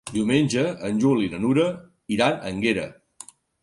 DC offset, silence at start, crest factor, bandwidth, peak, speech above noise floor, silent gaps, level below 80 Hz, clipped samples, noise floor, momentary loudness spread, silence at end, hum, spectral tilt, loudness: under 0.1%; 0.05 s; 18 dB; 11.5 kHz; -4 dBFS; 25 dB; none; -56 dBFS; under 0.1%; -47 dBFS; 21 LU; 0.7 s; none; -5.5 dB/octave; -23 LUFS